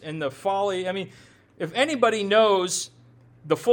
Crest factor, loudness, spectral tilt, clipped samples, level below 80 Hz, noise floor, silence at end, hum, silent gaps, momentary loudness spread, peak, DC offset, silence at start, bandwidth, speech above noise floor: 18 dB; -24 LUFS; -3.5 dB/octave; under 0.1%; -68 dBFS; -53 dBFS; 0 s; none; none; 14 LU; -6 dBFS; under 0.1%; 0 s; 18.5 kHz; 30 dB